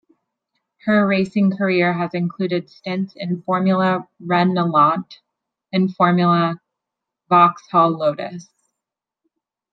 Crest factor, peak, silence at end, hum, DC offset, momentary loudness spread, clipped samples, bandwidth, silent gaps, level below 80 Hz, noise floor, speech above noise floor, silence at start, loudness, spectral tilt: 18 dB; -2 dBFS; 1.3 s; none; under 0.1%; 11 LU; under 0.1%; 6.4 kHz; none; -68 dBFS; -85 dBFS; 67 dB; 0.85 s; -18 LUFS; -8 dB/octave